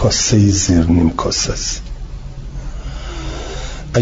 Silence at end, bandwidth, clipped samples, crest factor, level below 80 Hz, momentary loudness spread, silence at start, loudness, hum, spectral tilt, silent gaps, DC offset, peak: 0 s; 7.8 kHz; under 0.1%; 14 dB; -26 dBFS; 19 LU; 0 s; -15 LUFS; none; -4.5 dB/octave; none; under 0.1%; -2 dBFS